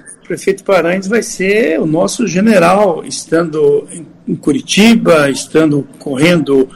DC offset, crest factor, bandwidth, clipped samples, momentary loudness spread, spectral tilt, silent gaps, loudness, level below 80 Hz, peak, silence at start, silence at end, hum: under 0.1%; 12 dB; 16 kHz; under 0.1%; 10 LU; -5 dB/octave; none; -12 LUFS; -46 dBFS; 0 dBFS; 0.05 s; 0 s; none